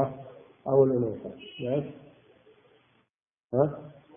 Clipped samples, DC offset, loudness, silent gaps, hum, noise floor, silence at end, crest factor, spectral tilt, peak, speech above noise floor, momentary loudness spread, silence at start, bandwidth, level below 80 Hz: under 0.1%; under 0.1%; -28 LUFS; 3.10-3.14 s, 3.40-3.49 s; none; -80 dBFS; 0.25 s; 20 dB; -11.5 dB/octave; -10 dBFS; 53 dB; 20 LU; 0 s; 3.6 kHz; -66 dBFS